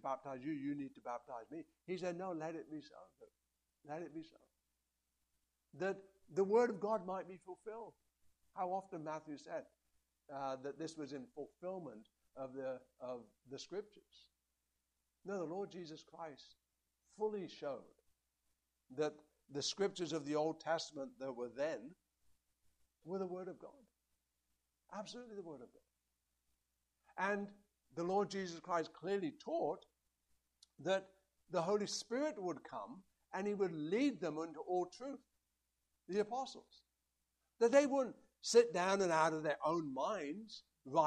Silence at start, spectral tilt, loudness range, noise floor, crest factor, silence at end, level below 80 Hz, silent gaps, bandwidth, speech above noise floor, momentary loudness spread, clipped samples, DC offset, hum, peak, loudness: 0.05 s; -4.5 dB/octave; 14 LU; -87 dBFS; 24 dB; 0 s; -84 dBFS; none; 12 kHz; 46 dB; 18 LU; under 0.1%; under 0.1%; none; -18 dBFS; -41 LUFS